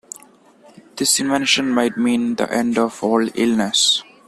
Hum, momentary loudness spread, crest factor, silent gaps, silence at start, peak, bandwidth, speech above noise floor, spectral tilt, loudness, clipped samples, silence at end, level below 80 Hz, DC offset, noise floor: none; 6 LU; 18 dB; none; 0.15 s; -2 dBFS; 14 kHz; 31 dB; -2.5 dB/octave; -17 LUFS; under 0.1%; 0.25 s; -60 dBFS; under 0.1%; -49 dBFS